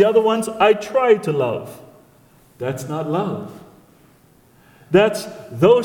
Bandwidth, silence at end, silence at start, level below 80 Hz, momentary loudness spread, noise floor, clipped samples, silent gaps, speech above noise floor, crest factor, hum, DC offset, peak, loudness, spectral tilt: 18 kHz; 0 s; 0 s; -58 dBFS; 14 LU; -52 dBFS; under 0.1%; none; 35 dB; 18 dB; none; under 0.1%; -2 dBFS; -19 LUFS; -6 dB/octave